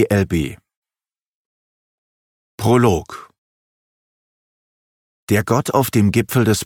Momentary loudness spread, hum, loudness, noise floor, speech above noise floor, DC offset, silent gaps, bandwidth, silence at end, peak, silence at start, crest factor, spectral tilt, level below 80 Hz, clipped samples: 10 LU; none; -17 LUFS; under -90 dBFS; over 74 dB; under 0.1%; 0.76-0.82 s, 1.22-2.58 s, 3.38-5.27 s; 17.5 kHz; 0 s; -2 dBFS; 0 s; 18 dB; -6 dB/octave; -44 dBFS; under 0.1%